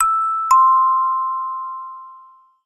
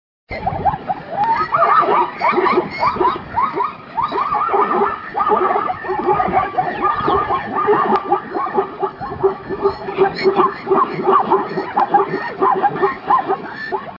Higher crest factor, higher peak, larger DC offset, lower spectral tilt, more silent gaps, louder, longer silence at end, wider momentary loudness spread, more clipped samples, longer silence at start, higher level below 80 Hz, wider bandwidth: about the same, 14 dB vs 16 dB; about the same, -4 dBFS vs -2 dBFS; neither; second, 1 dB/octave vs -8 dB/octave; neither; about the same, -16 LUFS vs -17 LUFS; first, 0.45 s vs 0 s; first, 20 LU vs 8 LU; neither; second, 0 s vs 0.3 s; second, -60 dBFS vs -48 dBFS; first, 13 kHz vs 5.8 kHz